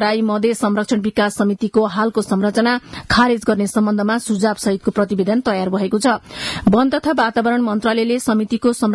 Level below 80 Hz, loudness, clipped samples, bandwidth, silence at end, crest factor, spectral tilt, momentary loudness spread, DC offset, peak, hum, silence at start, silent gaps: -48 dBFS; -17 LUFS; under 0.1%; 12 kHz; 0 s; 14 dB; -5 dB/octave; 4 LU; under 0.1%; -4 dBFS; none; 0 s; none